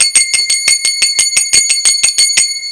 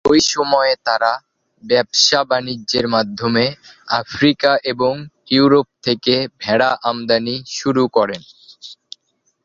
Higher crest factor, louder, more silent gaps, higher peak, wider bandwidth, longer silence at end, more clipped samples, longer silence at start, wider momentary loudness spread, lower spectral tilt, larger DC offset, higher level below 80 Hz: second, 12 dB vs 18 dB; first, -8 LUFS vs -16 LUFS; neither; about the same, 0 dBFS vs 0 dBFS; first, 11 kHz vs 7.6 kHz; second, 0 s vs 0.7 s; first, 0.6% vs under 0.1%; about the same, 0 s vs 0.05 s; second, 2 LU vs 10 LU; second, 4 dB/octave vs -3.5 dB/octave; neither; about the same, -50 dBFS vs -54 dBFS